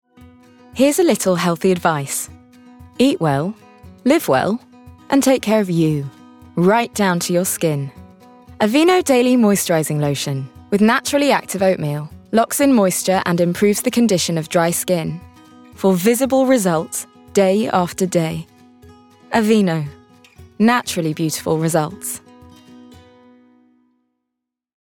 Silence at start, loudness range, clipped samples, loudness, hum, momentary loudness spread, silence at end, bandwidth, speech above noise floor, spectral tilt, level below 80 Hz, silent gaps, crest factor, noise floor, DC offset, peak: 0.2 s; 4 LU; under 0.1%; -17 LUFS; none; 11 LU; 2.75 s; 19 kHz; 64 dB; -5 dB/octave; -58 dBFS; none; 16 dB; -81 dBFS; under 0.1%; -2 dBFS